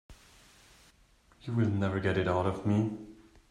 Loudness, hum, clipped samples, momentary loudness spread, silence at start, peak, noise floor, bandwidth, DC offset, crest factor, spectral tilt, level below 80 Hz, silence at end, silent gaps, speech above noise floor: -31 LUFS; none; under 0.1%; 16 LU; 0.1 s; -16 dBFS; -64 dBFS; 10.5 kHz; under 0.1%; 18 dB; -8 dB/octave; -60 dBFS; 0.35 s; none; 34 dB